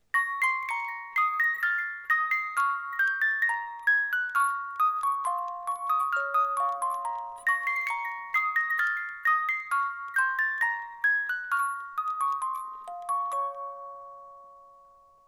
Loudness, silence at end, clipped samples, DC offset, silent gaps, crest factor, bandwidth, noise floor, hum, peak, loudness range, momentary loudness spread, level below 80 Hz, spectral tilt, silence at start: -27 LUFS; 0.55 s; under 0.1%; under 0.1%; none; 14 dB; 18 kHz; -57 dBFS; none; -14 dBFS; 4 LU; 8 LU; -76 dBFS; 1.5 dB/octave; 0.15 s